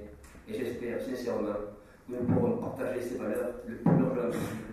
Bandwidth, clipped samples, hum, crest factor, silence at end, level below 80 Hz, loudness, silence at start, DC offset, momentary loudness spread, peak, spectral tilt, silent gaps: 14.5 kHz; under 0.1%; none; 20 dB; 0 s; -56 dBFS; -32 LUFS; 0 s; under 0.1%; 14 LU; -12 dBFS; -8 dB/octave; none